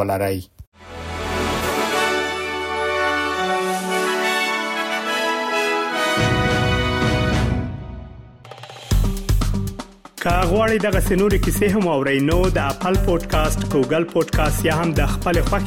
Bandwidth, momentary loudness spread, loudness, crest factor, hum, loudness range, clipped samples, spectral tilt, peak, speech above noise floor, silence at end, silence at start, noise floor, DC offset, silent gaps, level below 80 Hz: 17 kHz; 11 LU; -20 LUFS; 12 dB; none; 4 LU; under 0.1%; -5 dB/octave; -6 dBFS; 21 dB; 0 s; 0 s; -40 dBFS; under 0.1%; 0.67-0.72 s; -28 dBFS